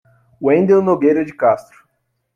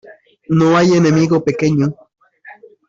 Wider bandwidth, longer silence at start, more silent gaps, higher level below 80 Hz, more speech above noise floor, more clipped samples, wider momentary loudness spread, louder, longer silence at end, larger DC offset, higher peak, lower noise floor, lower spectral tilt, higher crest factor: about the same, 7 kHz vs 7.6 kHz; first, 0.4 s vs 0.05 s; neither; second, -60 dBFS vs -52 dBFS; first, 54 dB vs 29 dB; neither; about the same, 7 LU vs 7 LU; about the same, -15 LUFS vs -14 LUFS; first, 0.75 s vs 0.35 s; neither; about the same, -2 dBFS vs -4 dBFS; first, -69 dBFS vs -41 dBFS; first, -9 dB/octave vs -7 dB/octave; about the same, 14 dB vs 12 dB